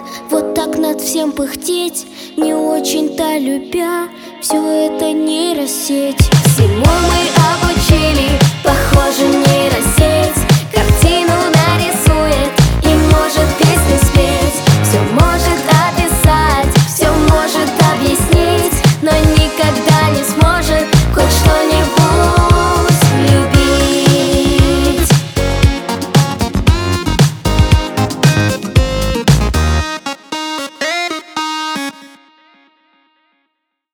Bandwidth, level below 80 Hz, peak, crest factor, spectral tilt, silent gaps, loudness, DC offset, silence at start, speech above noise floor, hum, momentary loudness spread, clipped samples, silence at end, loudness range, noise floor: over 20 kHz; -20 dBFS; 0 dBFS; 12 dB; -5 dB/octave; none; -12 LUFS; under 0.1%; 0 s; 58 dB; none; 7 LU; under 0.1%; 1.85 s; 6 LU; -70 dBFS